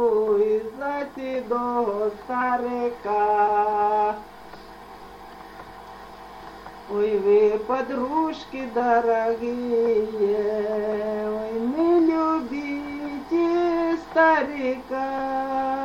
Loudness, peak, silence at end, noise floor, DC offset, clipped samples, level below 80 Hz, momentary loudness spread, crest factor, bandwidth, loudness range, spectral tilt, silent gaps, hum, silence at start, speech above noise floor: -23 LUFS; -8 dBFS; 0 s; -43 dBFS; under 0.1%; under 0.1%; -56 dBFS; 22 LU; 16 dB; 15 kHz; 4 LU; -6.5 dB/octave; none; none; 0 s; 20 dB